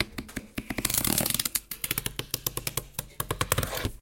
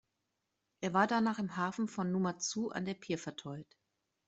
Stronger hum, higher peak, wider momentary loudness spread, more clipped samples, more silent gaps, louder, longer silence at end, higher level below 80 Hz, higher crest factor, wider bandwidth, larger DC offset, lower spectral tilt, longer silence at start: neither; first, -6 dBFS vs -16 dBFS; about the same, 12 LU vs 13 LU; neither; neither; first, -29 LUFS vs -35 LUFS; second, 0.05 s vs 0.65 s; first, -46 dBFS vs -76 dBFS; about the same, 26 dB vs 22 dB; first, 17.5 kHz vs 8.2 kHz; neither; second, -2.5 dB/octave vs -5 dB/octave; second, 0 s vs 0.8 s